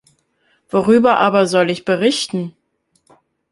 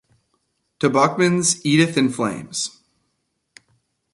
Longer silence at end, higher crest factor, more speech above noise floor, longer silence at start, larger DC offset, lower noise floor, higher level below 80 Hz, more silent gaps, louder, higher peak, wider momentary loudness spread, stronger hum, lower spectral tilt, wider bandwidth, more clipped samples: second, 1 s vs 1.45 s; about the same, 16 dB vs 20 dB; second, 47 dB vs 54 dB; about the same, 0.75 s vs 0.8 s; neither; second, -62 dBFS vs -73 dBFS; about the same, -58 dBFS vs -62 dBFS; neither; first, -15 LUFS vs -19 LUFS; about the same, -2 dBFS vs -2 dBFS; about the same, 11 LU vs 9 LU; neither; about the same, -5 dB/octave vs -4 dB/octave; about the same, 11.5 kHz vs 11.5 kHz; neither